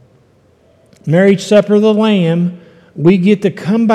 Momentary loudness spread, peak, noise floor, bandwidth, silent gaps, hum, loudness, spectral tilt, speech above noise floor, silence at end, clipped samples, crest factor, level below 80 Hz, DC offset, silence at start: 6 LU; 0 dBFS; -50 dBFS; 10 kHz; none; none; -12 LUFS; -7 dB/octave; 39 dB; 0 s; under 0.1%; 12 dB; -58 dBFS; under 0.1%; 1.05 s